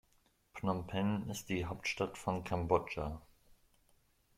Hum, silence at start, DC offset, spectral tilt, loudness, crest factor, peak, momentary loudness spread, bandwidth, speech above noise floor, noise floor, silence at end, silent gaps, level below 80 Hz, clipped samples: none; 0.55 s; under 0.1%; -5.5 dB/octave; -38 LUFS; 24 dB; -14 dBFS; 8 LU; 16 kHz; 36 dB; -73 dBFS; 1.15 s; none; -58 dBFS; under 0.1%